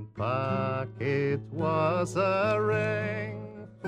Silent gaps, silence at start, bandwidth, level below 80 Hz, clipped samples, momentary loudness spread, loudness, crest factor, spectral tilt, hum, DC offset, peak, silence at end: none; 0 s; 11 kHz; -60 dBFS; under 0.1%; 8 LU; -29 LUFS; 16 dB; -7 dB/octave; none; under 0.1%; -14 dBFS; 0 s